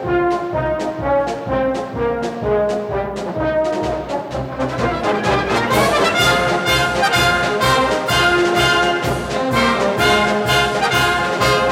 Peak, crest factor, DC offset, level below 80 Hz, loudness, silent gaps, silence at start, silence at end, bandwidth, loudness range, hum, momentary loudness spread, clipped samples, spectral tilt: -2 dBFS; 14 dB; under 0.1%; -36 dBFS; -17 LUFS; none; 0 s; 0 s; 17.5 kHz; 6 LU; none; 8 LU; under 0.1%; -4 dB/octave